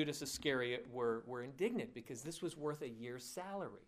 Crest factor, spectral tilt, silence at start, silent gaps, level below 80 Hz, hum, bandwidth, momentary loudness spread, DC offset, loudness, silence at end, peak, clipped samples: 18 dB; -4 dB/octave; 0 s; none; -72 dBFS; none; 15.5 kHz; 9 LU; under 0.1%; -43 LUFS; 0.05 s; -24 dBFS; under 0.1%